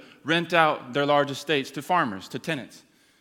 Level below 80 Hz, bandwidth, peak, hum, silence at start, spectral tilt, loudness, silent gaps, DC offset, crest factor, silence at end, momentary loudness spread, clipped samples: -74 dBFS; 18 kHz; -2 dBFS; none; 0 s; -4.5 dB/octave; -25 LUFS; none; under 0.1%; 22 dB; 0.45 s; 11 LU; under 0.1%